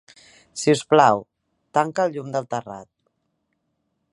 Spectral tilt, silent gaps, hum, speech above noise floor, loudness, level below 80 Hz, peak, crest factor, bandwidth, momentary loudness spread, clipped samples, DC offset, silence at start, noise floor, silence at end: -5 dB/octave; none; none; 54 dB; -21 LUFS; -68 dBFS; -2 dBFS; 22 dB; 11.5 kHz; 19 LU; under 0.1%; under 0.1%; 0.55 s; -74 dBFS; 1.3 s